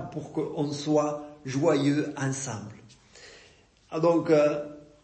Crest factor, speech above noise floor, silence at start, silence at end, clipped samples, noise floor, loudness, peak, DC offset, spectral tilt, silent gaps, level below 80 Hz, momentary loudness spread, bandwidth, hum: 18 dB; 32 dB; 0 s; 0.2 s; under 0.1%; -58 dBFS; -27 LUFS; -10 dBFS; under 0.1%; -6 dB/octave; none; -66 dBFS; 14 LU; 8.8 kHz; none